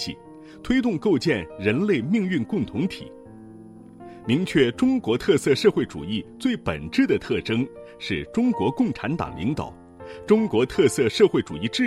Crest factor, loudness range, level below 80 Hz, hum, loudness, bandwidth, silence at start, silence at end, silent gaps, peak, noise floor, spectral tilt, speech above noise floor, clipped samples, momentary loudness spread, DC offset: 18 dB; 3 LU; -52 dBFS; none; -23 LUFS; 13.5 kHz; 0 s; 0 s; none; -4 dBFS; -44 dBFS; -6 dB/octave; 22 dB; under 0.1%; 16 LU; under 0.1%